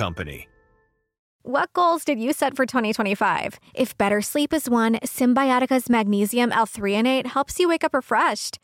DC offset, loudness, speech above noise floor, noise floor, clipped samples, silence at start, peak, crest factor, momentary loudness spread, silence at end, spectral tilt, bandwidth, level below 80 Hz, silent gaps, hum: under 0.1%; -22 LUFS; 43 dB; -65 dBFS; under 0.1%; 0 s; -8 dBFS; 14 dB; 7 LU; 0.1 s; -4 dB/octave; 17 kHz; -54 dBFS; 1.19-1.39 s; none